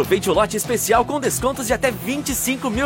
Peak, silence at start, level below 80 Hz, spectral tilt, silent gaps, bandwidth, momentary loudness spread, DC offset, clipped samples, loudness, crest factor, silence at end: -4 dBFS; 0 s; -40 dBFS; -3.5 dB/octave; none; 17 kHz; 4 LU; under 0.1%; under 0.1%; -20 LUFS; 16 dB; 0 s